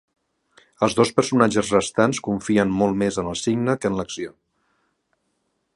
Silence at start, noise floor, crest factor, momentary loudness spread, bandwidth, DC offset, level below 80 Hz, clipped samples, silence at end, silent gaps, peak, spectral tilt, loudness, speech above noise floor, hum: 0.8 s; -72 dBFS; 22 dB; 8 LU; 11.5 kHz; under 0.1%; -52 dBFS; under 0.1%; 1.45 s; none; -2 dBFS; -5 dB/octave; -21 LUFS; 52 dB; none